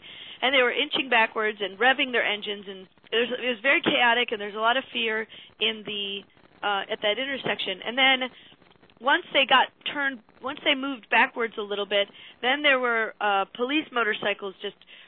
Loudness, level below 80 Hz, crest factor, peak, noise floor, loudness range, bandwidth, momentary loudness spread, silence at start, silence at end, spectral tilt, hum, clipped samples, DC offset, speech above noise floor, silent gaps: -24 LUFS; -74 dBFS; 20 dB; -6 dBFS; -56 dBFS; 3 LU; 4.5 kHz; 12 LU; 0.05 s; 0.1 s; -6 dB/octave; none; under 0.1%; under 0.1%; 31 dB; none